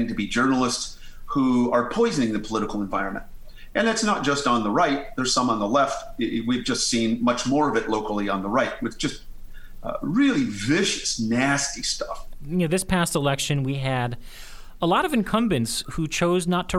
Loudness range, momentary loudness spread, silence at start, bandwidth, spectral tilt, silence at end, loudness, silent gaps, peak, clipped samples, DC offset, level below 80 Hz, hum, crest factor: 2 LU; 8 LU; 0 s; 15.5 kHz; -4.5 dB/octave; 0 s; -23 LUFS; none; -6 dBFS; under 0.1%; under 0.1%; -42 dBFS; none; 16 dB